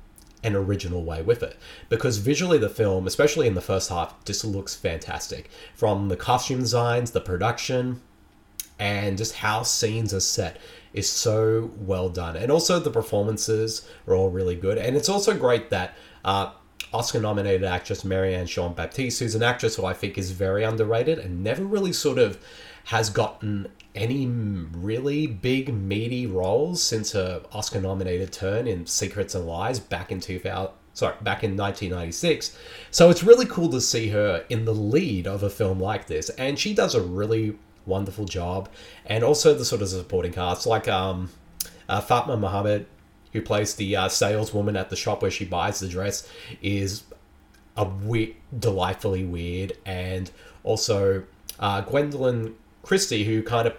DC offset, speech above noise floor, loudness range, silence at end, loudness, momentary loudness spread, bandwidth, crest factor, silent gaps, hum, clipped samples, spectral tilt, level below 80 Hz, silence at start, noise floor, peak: under 0.1%; 30 dB; 7 LU; 0 s; -25 LUFS; 10 LU; 19 kHz; 24 dB; none; none; under 0.1%; -4.5 dB/octave; -48 dBFS; 0 s; -55 dBFS; 0 dBFS